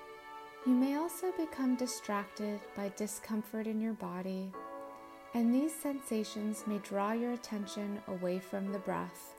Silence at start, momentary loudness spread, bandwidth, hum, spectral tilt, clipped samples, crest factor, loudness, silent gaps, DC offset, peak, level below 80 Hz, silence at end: 0 s; 11 LU; 16 kHz; none; -5.5 dB/octave; under 0.1%; 16 dB; -37 LUFS; none; under 0.1%; -20 dBFS; -76 dBFS; 0 s